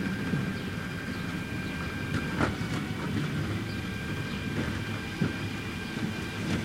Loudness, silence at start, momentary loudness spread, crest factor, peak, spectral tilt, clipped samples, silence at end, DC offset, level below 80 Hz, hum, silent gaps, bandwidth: -33 LUFS; 0 s; 5 LU; 20 dB; -12 dBFS; -6 dB/octave; under 0.1%; 0 s; under 0.1%; -48 dBFS; none; none; 16 kHz